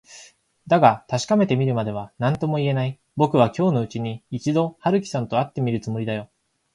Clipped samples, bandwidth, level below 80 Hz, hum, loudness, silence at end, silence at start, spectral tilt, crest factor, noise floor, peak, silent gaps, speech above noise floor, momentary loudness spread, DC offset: under 0.1%; 11 kHz; -58 dBFS; none; -22 LUFS; 0.5 s; 0.1 s; -7 dB/octave; 20 dB; -50 dBFS; -2 dBFS; none; 29 dB; 10 LU; under 0.1%